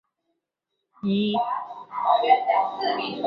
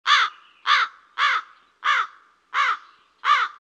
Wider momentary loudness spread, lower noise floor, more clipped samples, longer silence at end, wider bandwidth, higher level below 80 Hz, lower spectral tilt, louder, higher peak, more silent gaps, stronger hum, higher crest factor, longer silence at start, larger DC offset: first, 12 LU vs 9 LU; first, -81 dBFS vs -47 dBFS; neither; about the same, 0 s vs 0.1 s; second, 5.4 kHz vs 9.4 kHz; first, -72 dBFS vs -88 dBFS; first, -8 dB/octave vs 5 dB/octave; about the same, -23 LUFS vs -22 LUFS; about the same, -6 dBFS vs -6 dBFS; neither; neither; about the same, 20 dB vs 18 dB; first, 1.05 s vs 0.05 s; neither